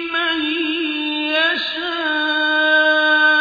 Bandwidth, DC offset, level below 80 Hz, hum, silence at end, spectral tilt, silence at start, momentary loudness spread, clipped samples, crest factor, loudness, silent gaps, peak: 5 kHz; under 0.1%; -60 dBFS; none; 0 s; -2.5 dB/octave; 0 s; 7 LU; under 0.1%; 14 dB; -16 LUFS; none; -4 dBFS